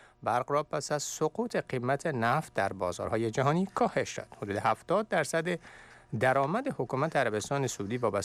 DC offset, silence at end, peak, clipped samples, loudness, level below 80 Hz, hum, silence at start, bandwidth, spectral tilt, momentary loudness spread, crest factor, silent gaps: under 0.1%; 0 s; -16 dBFS; under 0.1%; -31 LUFS; -64 dBFS; none; 0.2 s; 15 kHz; -5 dB/octave; 5 LU; 14 dB; none